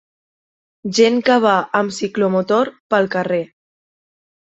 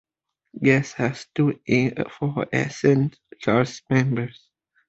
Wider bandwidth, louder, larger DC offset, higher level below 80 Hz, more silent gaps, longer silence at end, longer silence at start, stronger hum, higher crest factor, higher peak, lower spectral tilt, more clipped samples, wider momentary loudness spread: about the same, 8.2 kHz vs 8 kHz; first, -17 LUFS vs -23 LUFS; neither; second, -64 dBFS vs -58 dBFS; first, 2.80-2.90 s vs none; first, 1.15 s vs 0.6 s; first, 0.85 s vs 0.55 s; neither; about the same, 18 dB vs 20 dB; about the same, -2 dBFS vs -4 dBFS; second, -5 dB/octave vs -7 dB/octave; neither; about the same, 8 LU vs 8 LU